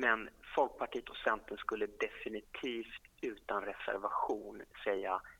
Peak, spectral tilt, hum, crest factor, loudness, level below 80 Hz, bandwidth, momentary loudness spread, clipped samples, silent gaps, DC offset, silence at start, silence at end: -14 dBFS; -4 dB/octave; none; 24 dB; -39 LUFS; -66 dBFS; 17.5 kHz; 8 LU; under 0.1%; none; under 0.1%; 0 s; 0.05 s